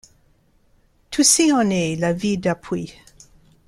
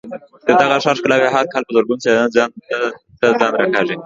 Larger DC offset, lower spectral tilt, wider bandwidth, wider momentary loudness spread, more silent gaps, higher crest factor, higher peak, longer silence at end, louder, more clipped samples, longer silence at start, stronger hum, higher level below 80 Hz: neither; about the same, -3.5 dB/octave vs -4.5 dB/octave; first, 15.5 kHz vs 7.8 kHz; first, 15 LU vs 7 LU; neither; about the same, 20 dB vs 16 dB; about the same, -2 dBFS vs 0 dBFS; first, 0.75 s vs 0 s; second, -19 LUFS vs -16 LUFS; neither; first, 1.1 s vs 0.05 s; neither; first, -54 dBFS vs -60 dBFS